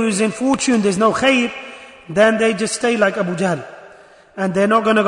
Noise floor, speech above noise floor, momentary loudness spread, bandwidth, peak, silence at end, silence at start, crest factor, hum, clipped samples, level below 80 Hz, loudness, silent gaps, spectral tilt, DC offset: -45 dBFS; 29 dB; 16 LU; 11 kHz; -2 dBFS; 0 s; 0 s; 14 dB; none; under 0.1%; -56 dBFS; -17 LUFS; none; -4.5 dB/octave; under 0.1%